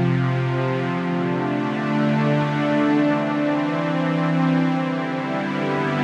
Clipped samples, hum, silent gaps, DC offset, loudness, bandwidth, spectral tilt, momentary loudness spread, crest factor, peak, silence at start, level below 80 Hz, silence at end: under 0.1%; none; none; under 0.1%; -21 LUFS; 8.8 kHz; -8 dB/octave; 4 LU; 12 dB; -8 dBFS; 0 s; -62 dBFS; 0 s